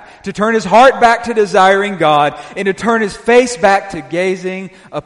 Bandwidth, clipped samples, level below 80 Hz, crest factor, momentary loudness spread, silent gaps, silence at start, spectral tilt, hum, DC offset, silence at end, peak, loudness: 11.5 kHz; 0.1%; -46 dBFS; 12 dB; 13 LU; none; 0.25 s; -4.5 dB/octave; none; under 0.1%; 0.05 s; 0 dBFS; -12 LUFS